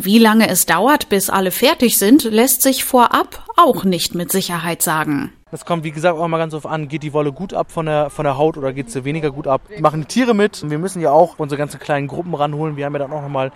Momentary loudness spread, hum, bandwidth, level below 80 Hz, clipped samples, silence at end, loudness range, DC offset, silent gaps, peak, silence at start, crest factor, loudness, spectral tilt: 11 LU; none; 17 kHz; -48 dBFS; under 0.1%; 0.05 s; 7 LU; under 0.1%; none; 0 dBFS; 0 s; 16 dB; -16 LUFS; -4 dB/octave